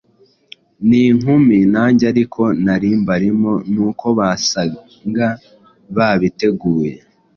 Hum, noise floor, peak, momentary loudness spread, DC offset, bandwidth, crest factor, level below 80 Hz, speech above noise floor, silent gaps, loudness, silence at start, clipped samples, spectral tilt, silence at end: none; -53 dBFS; -2 dBFS; 9 LU; under 0.1%; 7 kHz; 14 dB; -48 dBFS; 39 dB; none; -15 LUFS; 0.8 s; under 0.1%; -6 dB/octave; 0.4 s